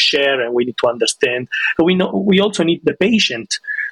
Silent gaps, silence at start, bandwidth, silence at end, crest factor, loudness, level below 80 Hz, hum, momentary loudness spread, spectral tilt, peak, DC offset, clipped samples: none; 0 s; 12 kHz; 0 s; 12 dB; -16 LUFS; -54 dBFS; none; 4 LU; -4 dB/octave; -4 dBFS; under 0.1%; under 0.1%